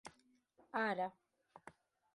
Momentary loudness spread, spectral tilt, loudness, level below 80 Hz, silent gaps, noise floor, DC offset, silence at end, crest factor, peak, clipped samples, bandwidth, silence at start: 22 LU; -5 dB/octave; -41 LUFS; -86 dBFS; none; -73 dBFS; under 0.1%; 0.45 s; 22 dB; -24 dBFS; under 0.1%; 11.5 kHz; 0.05 s